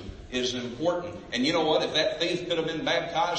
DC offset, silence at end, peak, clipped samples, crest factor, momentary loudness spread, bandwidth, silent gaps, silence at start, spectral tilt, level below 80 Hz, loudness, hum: under 0.1%; 0 s; -12 dBFS; under 0.1%; 16 dB; 7 LU; 8.8 kHz; none; 0 s; -4 dB/octave; -52 dBFS; -27 LUFS; none